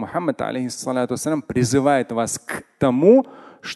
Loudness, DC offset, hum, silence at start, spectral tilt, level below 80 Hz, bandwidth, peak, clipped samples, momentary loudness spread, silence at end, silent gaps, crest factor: -20 LUFS; under 0.1%; none; 0 s; -5.5 dB/octave; -52 dBFS; 12.5 kHz; -2 dBFS; under 0.1%; 13 LU; 0 s; none; 18 dB